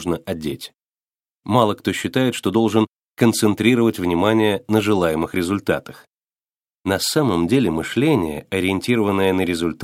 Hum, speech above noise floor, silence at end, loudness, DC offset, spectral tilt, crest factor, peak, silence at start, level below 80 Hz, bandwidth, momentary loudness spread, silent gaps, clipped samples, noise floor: none; over 71 dB; 0 s; -19 LUFS; under 0.1%; -5.5 dB/octave; 18 dB; 0 dBFS; 0 s; -50 dBFS; 16.5 kHz; 8 LU; 0.82-0.92 s, 1.02-1.06 s, 1.34-1.38 s, 2.89-3.15 s, 6.07-6.28 s, 6.56-6.60 s, 6.74-6.79 s; under 0.1%; under -90 dBFS